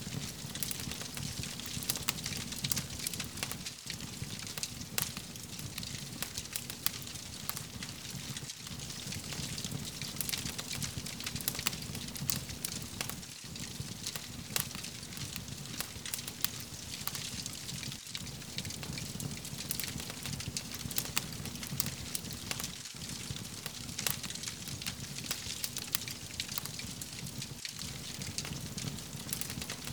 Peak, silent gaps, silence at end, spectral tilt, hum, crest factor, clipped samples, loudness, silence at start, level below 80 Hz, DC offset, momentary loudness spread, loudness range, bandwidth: -4 dBFS; none; 0 s; -2.5 dB/octave; none; 36 dB; under 0.1%; -38 LUFS; 0 s; -56 dBFS; under 0.1%; 7 LU; 3 LU; over 20 kHz